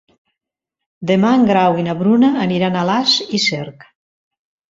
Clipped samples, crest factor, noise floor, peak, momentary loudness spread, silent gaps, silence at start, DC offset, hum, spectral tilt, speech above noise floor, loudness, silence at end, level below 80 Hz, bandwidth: under 0.1%; 16 dB; -82 dBFS; -2 dBFS; 7 LU; none; 1 s; under 0.1%; none; -5 dB/octave; 67 dB; -15 LUFS; 1 s; -56 dBFS; 7.8 kHz